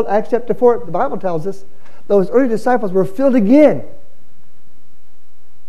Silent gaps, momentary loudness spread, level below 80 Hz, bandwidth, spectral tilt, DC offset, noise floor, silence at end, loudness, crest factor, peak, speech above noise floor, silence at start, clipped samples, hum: none; 12 LU; -54 dBFS; 13 kHz; -8 dB/octave; 10%; -56 dBFS; 1.8 s; -15 LUFS; 16 dB; 0 dBFS; 41 dB; 0 s; under 0.1%; none